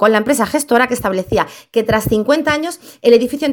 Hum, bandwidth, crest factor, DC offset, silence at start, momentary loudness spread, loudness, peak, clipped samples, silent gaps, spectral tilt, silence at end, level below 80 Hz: none; 19 kHz; 14 dB; under 0.1%; 0 s; 7 LU; -15 LUFS; 0 dBFS; under 0.1%; none; -4.5 dB/octave; 0 s; -42 dBFS